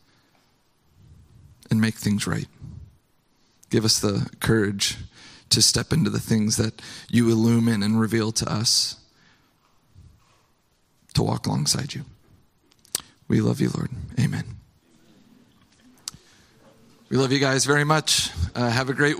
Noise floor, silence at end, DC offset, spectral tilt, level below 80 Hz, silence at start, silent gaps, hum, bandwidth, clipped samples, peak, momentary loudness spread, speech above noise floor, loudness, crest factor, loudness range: -65 dBFS; 0 s; under 0.1%; -4 dB/octave; -48 dBFS; 1.7 s; none; none; 16 kHz; under 0.1%; -4 dBFS; 17 LU; 43 dB; -22 LUFS; 22 dB; 8 LU